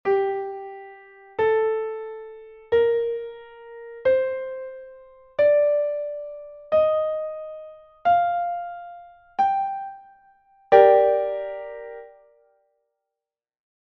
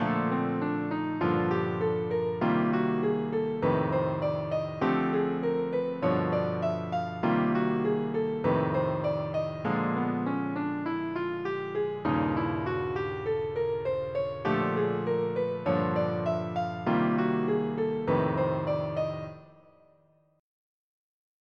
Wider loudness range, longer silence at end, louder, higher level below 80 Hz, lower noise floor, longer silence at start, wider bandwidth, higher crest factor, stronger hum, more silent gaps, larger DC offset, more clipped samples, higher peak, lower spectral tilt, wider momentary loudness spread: about the same, 4 LU vs 3 LU; about the same, 1.9 s vs 1.95 s; first, -22 LUFS vs -29 LUFS; about the same, -62 dBFS vs -62 dBFS; first, -89 dBFS vs -65 dBFS; about the same, 0.05 s vs 0 s; about the same, 6 kHz vs 6.6 kHz; first, 24 dB vs 16 dB; neither; neither; neither; neither; first, 0 dBFS vs -14 dBFS; second, -2.5 dB/octave vs -9 dB/octave; first, 22 LU vs 5 LU